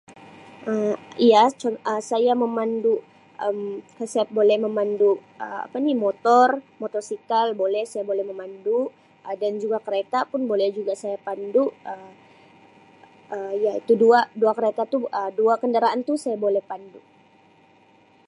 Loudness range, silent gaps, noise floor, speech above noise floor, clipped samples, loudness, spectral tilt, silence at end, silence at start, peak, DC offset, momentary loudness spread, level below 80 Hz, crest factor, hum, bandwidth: 5 LU; none; -56 dBFS; 34 dB; under 0.1%; -22 LUFS; -5 dB/octave; 1.3 s; 0.1 s; -4 dBFS; under 0.1%; 14 LU; -80 dBFS; 18 dB; none; 11.5 kHz